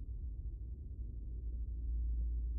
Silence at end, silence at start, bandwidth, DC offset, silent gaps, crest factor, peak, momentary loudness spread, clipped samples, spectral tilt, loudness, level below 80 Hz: 0 s; 0 s; 0.6 kHz; under 0.1%; none; 8 dB; -32 dBFS; 8 LU; under 0.1%; -18.5 dB/octave; -44 LUFS; -40 dBFS